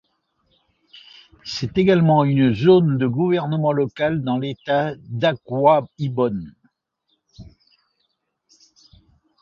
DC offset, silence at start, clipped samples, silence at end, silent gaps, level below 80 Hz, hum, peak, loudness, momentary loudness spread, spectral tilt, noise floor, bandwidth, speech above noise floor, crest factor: under 0.1%; 0.95 s; under 0.1%; 1.95 s; none; -54 dBFS; none; -2 dBFS; -19 LUFS; 12 LU; -8 dB/octave; -72 dBFS; 7.2 kHz; 53 dB; 18 dB